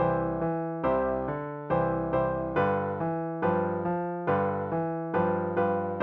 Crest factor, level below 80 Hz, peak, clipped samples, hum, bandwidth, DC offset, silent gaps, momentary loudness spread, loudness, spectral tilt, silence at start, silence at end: 16 dB; -52 dBFS; -12 dBFS; under 0.1%; none; 4.2 kHz; under 0.1%; none; 3 LU; -29 LUFS; -7.5 dB/octave; 0 s; 0 s